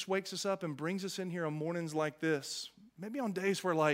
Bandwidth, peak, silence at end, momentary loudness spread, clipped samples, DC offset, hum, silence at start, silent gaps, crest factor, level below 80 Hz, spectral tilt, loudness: 16 kHz; -16 dBFS; 0 s; 8 LU; under 0.1%; under 0.1%; none; 0 s; none; 20 dB; -82 dBFS; -4.5 dB/octave; -36 LUFS